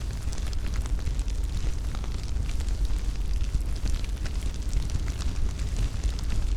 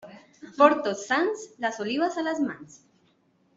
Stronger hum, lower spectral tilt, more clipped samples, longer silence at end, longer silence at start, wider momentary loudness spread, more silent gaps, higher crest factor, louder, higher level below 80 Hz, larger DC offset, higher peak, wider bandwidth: neither; about the same, -5 dB/octave vs -4 dB/octave; neither; second, 0 s vs 0.8 s; about the same, 0 s vs 0.05 s; second, 2 LU vs 11 LU; neither; second, 12 dB vs 22 dB; second, -32 LUFS vs -25 LUFS; first, -28 dBFS vs -74 dBFS; neither; second, -14 dBFS vs -4 dBFS; first, 13 kHz vs 7.8 kHz